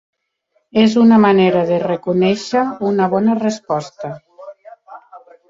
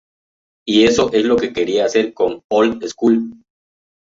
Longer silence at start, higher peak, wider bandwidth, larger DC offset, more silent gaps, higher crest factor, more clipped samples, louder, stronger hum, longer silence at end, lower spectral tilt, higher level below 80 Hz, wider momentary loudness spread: about the same, 0.75 s vs 0.65 s; about the same, -2 dBFS vs -2 dBFS; about the same, 7.6 kHz vs 7.8 kHz; neither; second, none vs 2.44-2.49 s; about the same, 14 dB vs 16 dB; neither; about the same, -15 LUFS vs -16 LUFS; neither; second, 0.3 s vs 0.7 s; first, -6.5 dB/octave vs -4.5 dB/octave; second, -58 dBFS vs -50 dBFS; first, 14 LU vs 6 LU